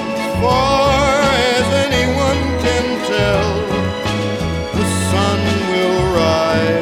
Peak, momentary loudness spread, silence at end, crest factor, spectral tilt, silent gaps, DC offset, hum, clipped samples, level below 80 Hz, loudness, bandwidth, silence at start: -2 dBFS; 6 LU; 0 s; 14 dB; -5 dB/octave; none; under 0.1%; none; under 0.1%; -30 dBFS; -15 LUFS; 17 kHz; 0 s